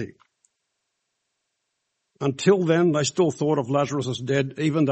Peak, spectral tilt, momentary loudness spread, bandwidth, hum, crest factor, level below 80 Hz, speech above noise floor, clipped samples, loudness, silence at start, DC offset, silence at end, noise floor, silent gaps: -4 dBFS; -6 dB/octave; 8 LU; 8.4 kHz; none; 20 dB; -66 dBFS; 56 dB; under 0.1%; -23 LUFS; 0 s; under 0.1%; 0 s; -78 dBFS; none